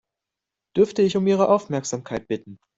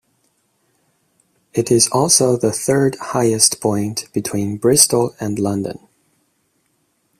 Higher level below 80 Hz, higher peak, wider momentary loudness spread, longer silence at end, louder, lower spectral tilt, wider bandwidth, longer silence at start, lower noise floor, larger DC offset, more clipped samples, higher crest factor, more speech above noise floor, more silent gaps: second, -60 dBFS vs -54 dBFS; second, -4 dBFS vs 0 dBFS; about the same, 11 LU vs 11 LU; second, 0.2 s vs 1.4 s; second, -22 LUFS vs -16 LUFS; first, -6 dB/octave vs -3.5 dB/octave; second, 8 kHz vs 16 kHz; second, 0.75 s vs 1.55 s; first, -86 dBFS vs -65 dBFS; neither; neither; about the same, 18 dB vs 18 dB; first, 64 dB vs 49 dB; neither